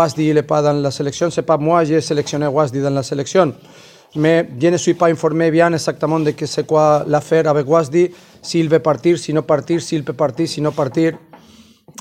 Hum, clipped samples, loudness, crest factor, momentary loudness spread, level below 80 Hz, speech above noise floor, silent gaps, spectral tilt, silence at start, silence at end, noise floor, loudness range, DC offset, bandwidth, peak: none; under 0.1%; -16 LUFS; 16 dB; 5 LU; -56 dBFS; 30 dB; none; -6 dB/octave; 0 s; 0.85 s; -46 dBFS; 2 LU; under 0.1%; 13.5 kHz; 0 dBFS